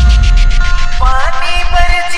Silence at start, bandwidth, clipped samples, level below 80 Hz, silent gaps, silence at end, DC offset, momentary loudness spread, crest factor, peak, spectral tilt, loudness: 0 s; 10.5 kHz; 1%; -8 dBFS; none; 0 s; under 0.1%; 5 LU; 8 dB; 0 dBFS; -4 dB/octave; -13 LUFS